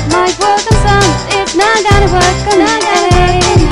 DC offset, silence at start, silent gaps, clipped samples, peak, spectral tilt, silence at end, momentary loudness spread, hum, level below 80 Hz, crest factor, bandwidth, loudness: under 0.1%; 0 s; none; 0.1%; 0 dBFS; -4.5 dB/octave; 0 s; 3 LU; none; -18 dBFS; 8 dB; 14.5 kHz; -9 LUFS